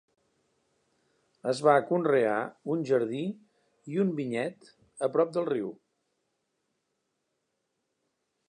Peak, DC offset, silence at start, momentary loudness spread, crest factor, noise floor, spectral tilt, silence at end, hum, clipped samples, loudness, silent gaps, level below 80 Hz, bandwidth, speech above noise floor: -8 dBFS; under 0.1%; 1.45 s; 13 LU; 24 dB; -80 dBFS; -6.5 dB/octave; 2.75 s; none; under 0.1%; -29 LUFS; none; -84 dBFS; 11 kHz; 53 dB